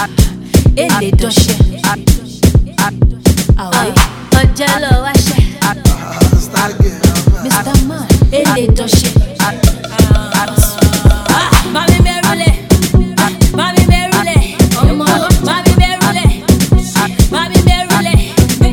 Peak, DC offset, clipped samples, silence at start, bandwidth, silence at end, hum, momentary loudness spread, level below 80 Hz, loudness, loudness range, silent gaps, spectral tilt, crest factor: 0 dBFS; 0.4%; 2%; 0 s; over 20 kHz; 0 s; none; 3 LU; -16 dBFS; -11 LUFS; 1 LU; none; -5 dB/octave; 10 dB